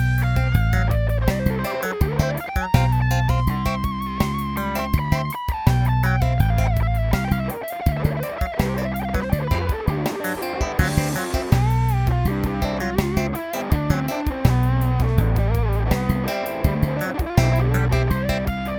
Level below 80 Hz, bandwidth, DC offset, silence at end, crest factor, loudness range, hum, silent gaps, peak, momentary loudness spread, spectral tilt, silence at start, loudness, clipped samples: -26 dBFS; 19 kHz; under 0.1%; 0 s; 18 dB; 2 LU; none; none; -2 dBFS; 5 LU; -6.5 dB/octave; 0 s; -22 LUFS; under 0.1%